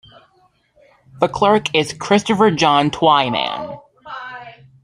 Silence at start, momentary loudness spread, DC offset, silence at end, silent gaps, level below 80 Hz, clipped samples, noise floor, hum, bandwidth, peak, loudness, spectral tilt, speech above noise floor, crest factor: 1.15 s; 19 LU; under 0.1%; 0.35 s; none; -54 dBFS; under 0.1%; -58 dBFS; none; 12 kHz; 0 dBFS; -16 LUFS; -4.5 dB/octave; 43 dB; 18 dB